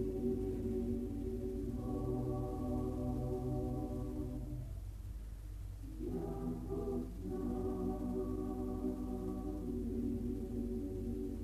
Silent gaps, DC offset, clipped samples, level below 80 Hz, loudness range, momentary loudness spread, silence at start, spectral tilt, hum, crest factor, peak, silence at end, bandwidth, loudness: none; under 0.1%; under 0.1%; -46 dBFS; 4 LU; 7 LU; 0 s; -9.5 dB/octave; none; 12 dB; -26 dBFS; 0 s; 14 kHz; -41 LUFS